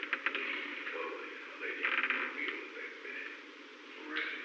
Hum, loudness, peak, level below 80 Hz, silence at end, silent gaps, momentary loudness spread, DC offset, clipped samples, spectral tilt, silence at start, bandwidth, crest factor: none; -37 LUFS; -16 dBFS; under -90 dBFS; 0 s; none; 16 LU; under 0.1%; under 0.1%; -1 dB/octave; 0 s; 8.4 kHz; 24 dB